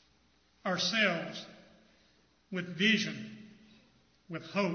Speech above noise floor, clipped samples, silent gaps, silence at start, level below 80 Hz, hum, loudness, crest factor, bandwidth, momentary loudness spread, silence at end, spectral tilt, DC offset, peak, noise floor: 37 dB; under 0.1%; none; 0.65 s; -76 dBFS; none; -31 LUFS; 22 dB; 6.6 kHz; 19 LU; 0 s; -4 dB/octave; under 0.1%; -14 dBFS; -69 dBFS